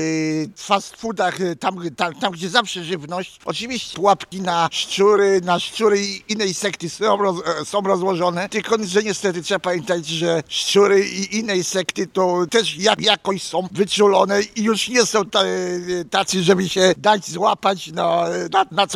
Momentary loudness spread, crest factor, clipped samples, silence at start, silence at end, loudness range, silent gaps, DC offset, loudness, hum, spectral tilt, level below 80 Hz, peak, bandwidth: 9 LU; 20 dB; under 0.1%; 0 s; 0 s; 4 LU; none; under 0.1%; -19 LUFS; none; -3.5 dB/octave; -60 dBFS; 0 dBFS; 14.5 kHz